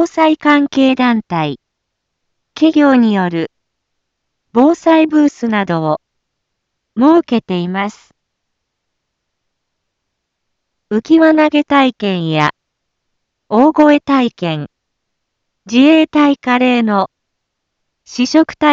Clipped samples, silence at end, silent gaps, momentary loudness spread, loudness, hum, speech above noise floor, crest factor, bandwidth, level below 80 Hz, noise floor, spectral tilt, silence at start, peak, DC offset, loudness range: under 0.1%; 0 s; none; 11 LU; -12 LUFS; none; 62 dB; 14 dB; 7.6 kHz; -58 dBFS; -74 dBFS; -6 dB/octave; 0 s; 0 dBFS; under 0.1%; 5 LU